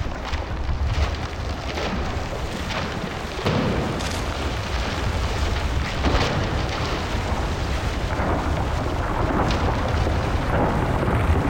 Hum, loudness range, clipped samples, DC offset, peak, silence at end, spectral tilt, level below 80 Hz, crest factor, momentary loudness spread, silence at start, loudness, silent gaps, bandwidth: none; 3 LU; under 0.1%; under 0.1%; -8 dBFS; 0 s; -5.5 dB/octave; -28 dBFS; 16 dB; 6 LU; 0 s; -24 LUFS; none; 16.5 kHz